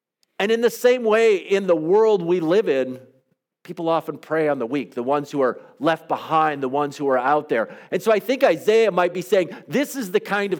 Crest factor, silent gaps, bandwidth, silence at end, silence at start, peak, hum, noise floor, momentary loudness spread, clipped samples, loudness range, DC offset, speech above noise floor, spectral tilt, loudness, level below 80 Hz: 18 dB; none; 19 kHz; 0 s; 0.4 s; -2 dBFS; none; -66 dBFS; 8 LU; under 0.1%; 5 LU; under 0.1%; 46 dB; -5 dB/octave; -21 LUFS; -78 dBFS